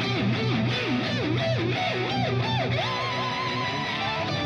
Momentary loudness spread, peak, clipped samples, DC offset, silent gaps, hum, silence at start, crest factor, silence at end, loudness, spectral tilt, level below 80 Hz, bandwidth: 2 LU; -14 dBFS; under 0.1%; under 0.1%; none; none; 0 s; 12 dB; 0 s; -26 LUFS; -6 dB/octave; -56 dBFS; 7.4 kHz